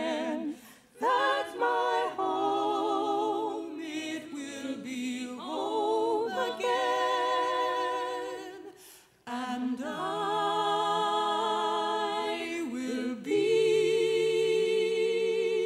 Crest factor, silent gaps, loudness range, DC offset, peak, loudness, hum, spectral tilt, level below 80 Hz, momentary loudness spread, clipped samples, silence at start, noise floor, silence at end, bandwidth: 14 dB; none; 5 LU; under 0.1%; -16 dBFS; -30 LUFS; none; -3.5 dB/octave; -76 dBFS; 11 LU; under 0.1%; 0 s; -55 dBFS; 0 s; 14.5 kHz